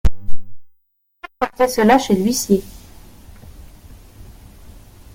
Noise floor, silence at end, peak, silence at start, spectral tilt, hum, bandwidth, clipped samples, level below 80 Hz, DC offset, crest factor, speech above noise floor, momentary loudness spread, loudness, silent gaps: -62 dBFS; 2.35 s; 0 dBFS; 0.05 s; -5 dB/octave; none; 17 kHz; under 0.1%; -32 dBFS; under 0.1%; 18 dB; 47 dB; 26 LU; -17 LUFS; none